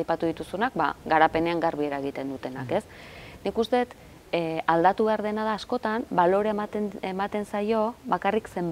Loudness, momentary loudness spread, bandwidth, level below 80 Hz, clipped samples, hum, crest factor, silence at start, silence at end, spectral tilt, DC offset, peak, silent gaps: -26 LUFS; 10 LU; 16 kHz; -56 dBFS; under 0.1%; none; 22 dB; 0 s; 0 s; -6.5 dB/octave; under 0.1%; -4 dBFS; none